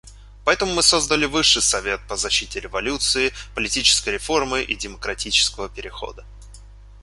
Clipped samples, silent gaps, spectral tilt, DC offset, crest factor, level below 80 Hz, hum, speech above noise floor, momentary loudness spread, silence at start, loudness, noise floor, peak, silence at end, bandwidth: under 0.1%; none; -1 dB/octave; under 0.1%; 20 dB; -40 dBFS; none; 21 dB; 13 LU; 0.05 s; -19 LUFS; -42 dBFS; -2 dBFS; 0 s; 12 kHz